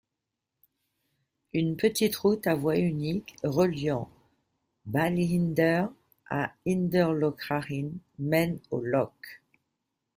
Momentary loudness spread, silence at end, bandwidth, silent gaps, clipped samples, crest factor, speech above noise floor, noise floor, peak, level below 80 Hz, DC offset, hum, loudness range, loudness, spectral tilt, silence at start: 10 LU; 0.8 s; 16 kHz; none; under 0.1%; 18 dB; 59 dB; -86 dBFS; -10 dBFS; -62 dBFS; under 0.1%; none; 2 LU; -28 LUFS; -6.5 dB/octave; 1.55 s